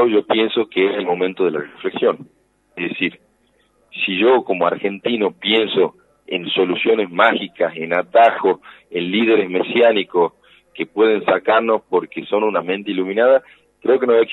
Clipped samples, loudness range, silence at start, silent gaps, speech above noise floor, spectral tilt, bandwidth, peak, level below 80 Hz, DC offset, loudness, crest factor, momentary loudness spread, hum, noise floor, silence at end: under 0.1%; 4 LU; 0 s; none; 43 dB; -7 dB/octave; 4.1 kHz; 0 dBFS; -68 dBFS; under 0.1%; -18 LUFS; 16 dB; 10 LU; none; -60 dBFS; 0 s